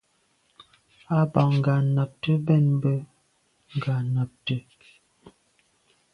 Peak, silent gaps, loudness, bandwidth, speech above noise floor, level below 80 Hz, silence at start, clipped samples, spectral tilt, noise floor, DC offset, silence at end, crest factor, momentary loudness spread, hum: -6 dBFS; none; -24 LUFS; 5.6 kHz; 45 dB; -62 dBFS; 1.1 s; under 0.1%; -9 dB/octave; -68 dBFS; under 0.1%; 0.85 s; 20 dB; 10 LU; none